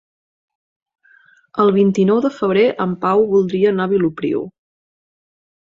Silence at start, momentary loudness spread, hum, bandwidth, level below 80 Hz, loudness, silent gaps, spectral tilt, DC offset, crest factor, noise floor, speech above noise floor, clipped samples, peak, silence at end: 1.55 s; 8 LU; none; 7.6 kHz; -58 dBFS; -16 LUFS; none; -8 dB/octave; under 0.1%; 16 dB; -52 dBFS; 36 dB; under 0.1%; -2 dBFS; 1.1 s